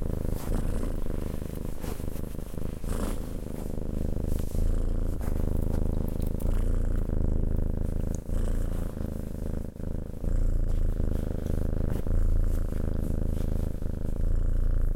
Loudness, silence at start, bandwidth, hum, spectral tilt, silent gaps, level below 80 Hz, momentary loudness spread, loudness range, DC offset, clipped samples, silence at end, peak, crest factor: -33 LUFS; 0 s; 15.5 kHz; none; -8 dB/octave; none; -28 dBFS; 6 LU; 4 LU; under 0.1%; under 0.1%; 0 s; -14 dBFS; 12 dB